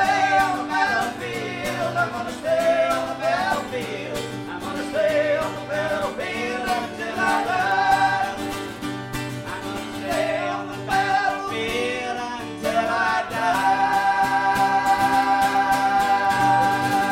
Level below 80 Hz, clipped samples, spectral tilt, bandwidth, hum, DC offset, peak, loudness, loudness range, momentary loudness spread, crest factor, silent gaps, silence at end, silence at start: -50 dBFS; under 0.1%; -4 dB/octave; 16.5 kHz; none; under 0.1%; -6 dBFS; -22 LUFS; 5 LU; 10 LU; 16 dB; none; 0 s; 0 s